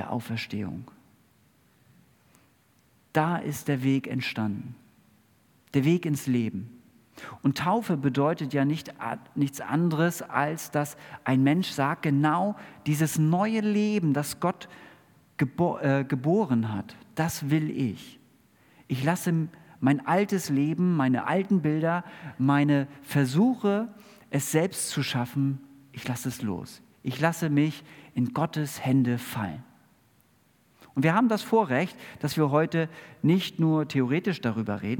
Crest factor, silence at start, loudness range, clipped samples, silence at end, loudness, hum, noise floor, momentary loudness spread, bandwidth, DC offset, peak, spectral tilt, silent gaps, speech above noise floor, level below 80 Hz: 20 dB; 0 s; 5 LU; under 0.1%; 0 s; -27 LUFS; none; -64 dBFS; 11 LU; 18 kHz; under 0.1%; -6 dBFS; -6 dB/octave; none; 38 dB; -70 dBFS